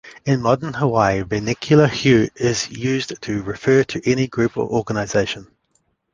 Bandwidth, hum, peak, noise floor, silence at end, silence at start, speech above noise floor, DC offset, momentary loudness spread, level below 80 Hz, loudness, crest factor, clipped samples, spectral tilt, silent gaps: 9.8 kHz; none; -2 dBFS; -66 dBFS; 0.7 s; 0.05 s; 48 dB; under 0.1%; 8 LU; -46 dBFS; -19 LUFS; 18 dB; under 0.1%; -5.5 dB/octave; none